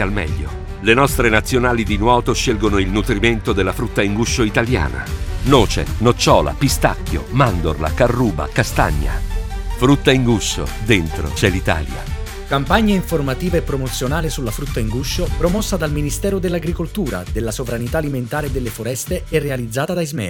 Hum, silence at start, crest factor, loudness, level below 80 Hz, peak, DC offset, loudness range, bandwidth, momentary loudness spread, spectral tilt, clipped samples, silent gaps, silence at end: none; 0 s; 18 dB; -18 LUFS; -26 dBFS; 0 dBFS; under 0.1%; 5 LU; 18.5 kHz; 9 LU; -5 dB/octave; under 0.1%; none; 0 s